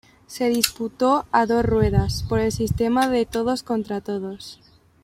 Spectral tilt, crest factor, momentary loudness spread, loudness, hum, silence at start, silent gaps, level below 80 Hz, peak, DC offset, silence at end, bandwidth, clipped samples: -5.5 dB/octave; 22 dB; 10 LU; -22 LUFS; none; 0.3 s; none; -38 dBFS; 0 dBFS; under 0.1%; 0.5 s; 16.5 kHz; under 0.1%